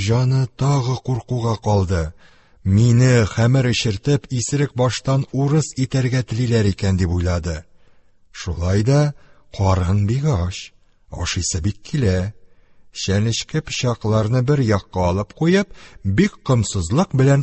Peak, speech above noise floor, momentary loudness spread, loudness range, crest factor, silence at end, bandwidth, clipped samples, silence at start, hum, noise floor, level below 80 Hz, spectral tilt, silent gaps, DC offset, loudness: -2 dBFS; 32 dB; 11 LU; 4 LU; 16 dB; 0 s; 8.6 kHz; under 0.1%; 0 s; none; -50 dBFS; -34 dBFS; -6 dB/octave; none; under 0.1%; -19 LUFS